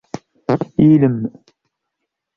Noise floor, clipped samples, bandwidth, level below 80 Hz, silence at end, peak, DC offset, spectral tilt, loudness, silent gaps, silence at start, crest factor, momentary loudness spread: -78 dBFS; under 0.1%; 6.8 kHz; -50 dBFS; 1.1 s; -2 dBFS; under 0.1%; -9.5 dB/octave; -15 LUFS; none; 0.15 s; 16 dB; 16 LU